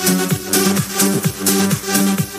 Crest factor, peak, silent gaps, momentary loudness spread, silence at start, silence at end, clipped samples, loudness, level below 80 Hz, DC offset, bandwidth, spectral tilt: 14 dB; -2 dBFS; none; 2 LU; 0 s; 0 s; under 0.1%; -16 LUFS; -50 dBFS; under 0.1%; 15.5 kHz; -3.5 dB/octave